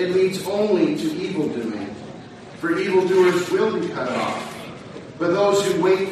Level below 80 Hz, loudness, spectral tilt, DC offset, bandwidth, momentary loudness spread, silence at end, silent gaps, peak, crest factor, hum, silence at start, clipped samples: -60 dBFS; -21 LUFS; -5.5 dB/octave; under 0.1%; 13 kHz; 18 LU; 0 s; none; -6 dBFS; 16 dB; none; 0 s; under 0.1%